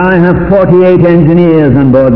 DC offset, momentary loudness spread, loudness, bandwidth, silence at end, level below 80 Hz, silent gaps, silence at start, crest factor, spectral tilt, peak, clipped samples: 2%; 2 LU; -6 LUFS; 5.4 kHz; 0 s; -28 dBFS; none; 0 s; 6 dB; -11.5 dB/octave; 0 dBFS; 9%